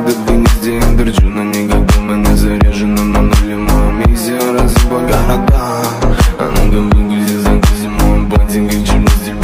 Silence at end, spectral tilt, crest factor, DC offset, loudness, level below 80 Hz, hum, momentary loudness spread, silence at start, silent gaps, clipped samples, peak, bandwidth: 0 s; -6 dB/octave; 10 dB; under 0.1%; -12 LUFS; -12 dBFS; none; 2 LU; 0 s; none; under 0.1%; 0 dBFS; 16 kHz